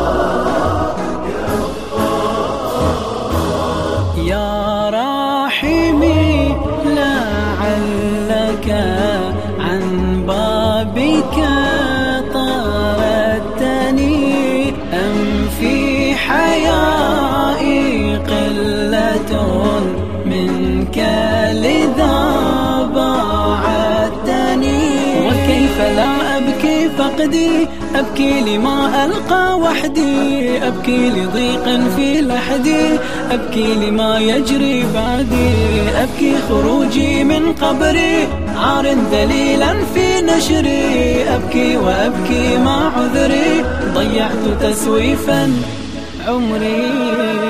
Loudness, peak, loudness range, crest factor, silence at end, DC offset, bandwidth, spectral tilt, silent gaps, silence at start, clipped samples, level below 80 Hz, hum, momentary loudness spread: -15 LUFS; 0 dBFS; 3 LU; 14 dB; 0 s; 4%; 15.5 kHz; -5.5 dB/octave; none; 0 s; under 0.1%; -30 dBFS; none; 4 LU